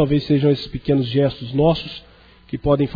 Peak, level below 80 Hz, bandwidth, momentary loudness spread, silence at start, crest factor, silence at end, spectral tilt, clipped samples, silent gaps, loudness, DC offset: -4 dBFS; -40 dBFS; 5 kHz; 13 LU; 0 s; 14 dB; 0 s; -9.5 dB/octave; under 0.1%; none; -19 LUFS; under 0.1%